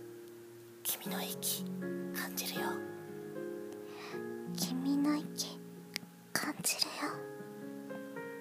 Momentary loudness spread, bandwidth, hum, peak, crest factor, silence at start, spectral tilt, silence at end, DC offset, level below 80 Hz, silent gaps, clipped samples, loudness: 14 LU; 15.5 kHz; none; -12 dBFS; 26 dB; 0 s; -3 dB/octave; 0 s; under 0.1%; -84 dBFS; none; under 0.1%; -38 LUFS